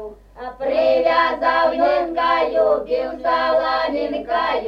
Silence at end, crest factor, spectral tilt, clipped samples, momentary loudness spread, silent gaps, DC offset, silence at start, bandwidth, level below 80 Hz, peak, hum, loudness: 0 s; 14 dB; -5 dB/octave; under 0.1%; 7 LU; none; under 0.1%; 0 s; 6.4 kHz; -48 dBFS; -4 dBFS; none; -18 LUFS